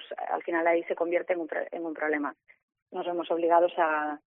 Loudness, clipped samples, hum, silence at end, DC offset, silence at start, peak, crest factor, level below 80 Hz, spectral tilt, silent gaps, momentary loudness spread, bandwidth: -28 LUFS; under 0.1%; none; 0.1 s; under 0.1%; 0 s; -10 dBFS; 18 dB; -84 dBFS; -2 dB/octave; 2.63-2.68 s, 2.82-2.86 s; 11 LU; 3.8 kHz